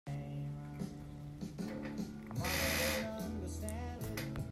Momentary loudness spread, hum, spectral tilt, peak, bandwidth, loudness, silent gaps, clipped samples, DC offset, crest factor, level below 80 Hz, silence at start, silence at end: 12 LU; none; -4.5 dB/octave; -22 dBFS; 16 kHz; -40 LUFS; none; under 0.1%; under 0.1%; 18 dB; -54 dBFS; 0.05 s; 0 s